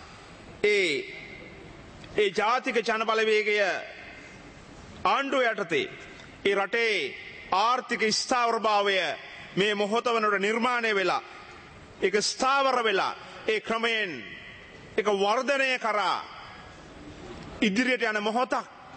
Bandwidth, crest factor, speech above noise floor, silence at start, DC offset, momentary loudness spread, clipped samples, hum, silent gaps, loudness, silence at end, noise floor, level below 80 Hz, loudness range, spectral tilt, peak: 8.8 kHz; 18 dB; 21 dB; 0 s; under 0.1%; 21 LU; under 0.1%; none; none; -26 LUFS; 0 s; -47 dBFS; -60 dBFS; 3 LU; -3 dB/octave; -10 dBFS